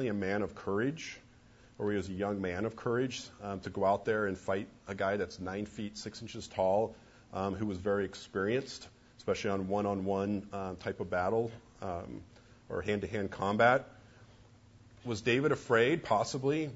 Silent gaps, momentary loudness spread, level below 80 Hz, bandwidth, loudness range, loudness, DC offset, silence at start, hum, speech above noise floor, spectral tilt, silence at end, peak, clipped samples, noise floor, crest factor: none; 14 LU; -62 dBFS; 8 kHz; 5 LU; -34 LUFS; under 0.1%; 0 s; none; 26 dB; -5.5 dB/octave; 0 s; -12 dBFS; under 0.1%; -60 dBFS; 22 dB